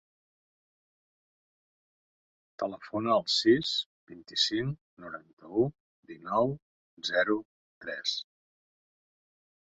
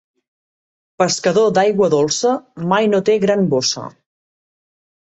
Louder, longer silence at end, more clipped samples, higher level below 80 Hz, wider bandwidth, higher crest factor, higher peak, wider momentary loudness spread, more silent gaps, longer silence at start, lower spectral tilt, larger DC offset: second, -30 LUFS vs -16 LUFS; first, 1.4 s vs 1.15 s; neither; second, -68 dBFS vs -60 dBFS; about the same, 8.2 kHz vs 8.2 kHz; first, 22 dB vs 16 dB; second, -12 dBFS vs -2 dBFS; first, 19 LU vs 6 LU; first, 3.86-4.07 s, 4.81-4.97 s, 5.33-5.37 s, 5.80-6.03 s, 6.62-6.97 s, 7.45-7.81 s vs none; first, 2.6 s vs 1 s; about the same, -4.5 dB/octave vs -4.5 dB/octave; neither